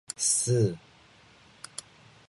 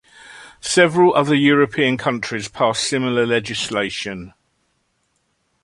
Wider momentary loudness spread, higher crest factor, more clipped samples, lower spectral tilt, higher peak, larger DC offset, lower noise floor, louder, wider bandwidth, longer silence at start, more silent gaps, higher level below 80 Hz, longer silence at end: first, 21 LU vs 12 LU; about the same, 18 dB vs 18 dB; neither; about the same, -4 dB/octave vs -4 dB/octave; second, -14 dBFS vs -2 dBFS; neither; second, -57 dBFS vs -67 dBFS; second, -26 LUFS vs -18 LUFS; about the same, 11.5 kHz vs 11.5 kHz; second, 0.1 s vs 0.25 s; neither; second, -62 dBFS vs -56 dBFS; first, 1.5 s vs 1.35 s